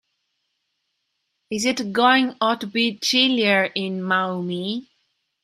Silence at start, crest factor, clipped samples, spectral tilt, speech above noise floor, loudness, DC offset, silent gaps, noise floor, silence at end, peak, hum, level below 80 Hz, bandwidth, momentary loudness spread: 1.5 s; 20 dB; under 0.1%; -3.5 dB/octave; 54 dB; -20 LUFS; under 0.1%; none; -75 dBFS; 0.6 s; -4 dBFS; none; -70 dBFS; 14 kHz; 10 LU